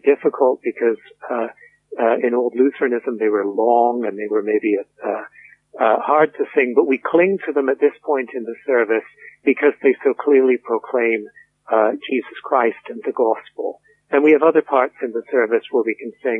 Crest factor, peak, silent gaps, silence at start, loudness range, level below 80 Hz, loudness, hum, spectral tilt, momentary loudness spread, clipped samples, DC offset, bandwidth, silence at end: 16 dB; -2 dBFS; none; 0.05 s; 2 LU; -76 dBFS; -19 LUFS; none; -8 dB/octave; 10 LU; under 0.1%; under 0.1%; 3.8 kHz; 0 s